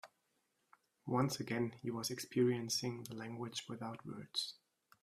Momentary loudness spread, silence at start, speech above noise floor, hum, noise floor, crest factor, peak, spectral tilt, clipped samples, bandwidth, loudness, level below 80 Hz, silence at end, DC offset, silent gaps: 12 LU; 0.05 s; 42 dB; none; -82 dBFS; 20 dB; -20 dBFS; -4.5 dB/octave; under 0.1%; 15.5 kHz; -40 LUFS; -80 dBFS; 0.5 s; under 0.1%; none